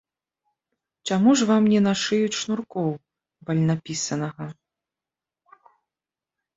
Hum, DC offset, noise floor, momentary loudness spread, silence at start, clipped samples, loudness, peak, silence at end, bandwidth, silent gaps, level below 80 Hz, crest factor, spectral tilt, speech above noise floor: none; under 0.1%; -90 dBFS; 18 LU; 1.05 s; under 0.1%; -22 LUFS; -8 dBFS; 2.05 s; 8 kHz; none; -64 dBFS; 18 dB; -5 dB/octave; 68 dB